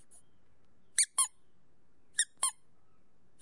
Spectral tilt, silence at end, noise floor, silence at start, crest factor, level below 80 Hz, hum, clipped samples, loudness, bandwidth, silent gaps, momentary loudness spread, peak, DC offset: 4 dB/octave; 0.9 s; -73 dBFS; 1 s; 28 dB; -78 dBFS; none; under 0.1%; -31 LUFS; 11.5 kHz; none; 6 LU; -10 dBFS; 0.2%